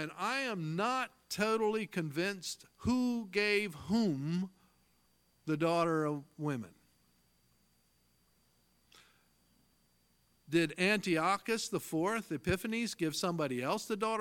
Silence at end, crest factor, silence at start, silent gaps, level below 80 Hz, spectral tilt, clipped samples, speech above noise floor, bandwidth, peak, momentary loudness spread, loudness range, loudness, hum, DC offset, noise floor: 0 s; 20 dB; 0 s; none; -64 dBFS; -5 dB/octave; under 0.1%; 39 dB; 17.5 kHz; -16 dBFS; 8 LU; 7 LU; -34 LUFS; 60 Hz at -65 dBFS; under 0.1%; -73 dBFS